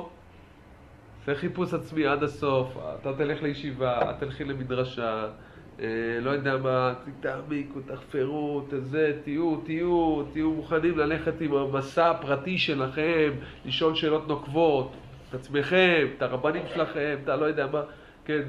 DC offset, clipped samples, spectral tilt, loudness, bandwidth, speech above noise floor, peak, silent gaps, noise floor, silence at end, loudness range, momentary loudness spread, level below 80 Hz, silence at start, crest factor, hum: under 0.1%; under 0.1%; -7 dB/octave; -27 LUFS; 11 kHz; 24 dB; -6 dBFS; none; -51 dBFS; 0 s; 4 LU; 10 LU; -54 dBFS; 0 s; 20 dB; none